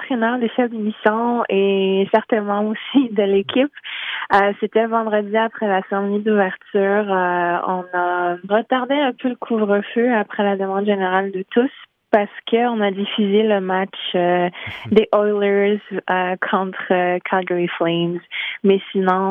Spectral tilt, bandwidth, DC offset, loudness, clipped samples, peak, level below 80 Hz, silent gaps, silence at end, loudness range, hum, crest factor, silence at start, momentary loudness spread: -8.5 dB/octave; 4.9 kHz; under 0.1%; -19 LUFS; under 0.1%; -2 dBFS; -64 dBFS; none; 0 s; 1 LU; none; 18 dB; 0 s; 5 LU